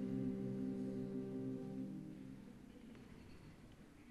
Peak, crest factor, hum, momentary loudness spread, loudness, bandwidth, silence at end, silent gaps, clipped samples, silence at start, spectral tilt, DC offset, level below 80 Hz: -32 dBFS; 16 dB; none; 17 LU; -46 LUFS; 12.5 kHz; 0 s; none; under 0.1%; 0 s; -9 dB/octave; under 0.1%; -68 dBFS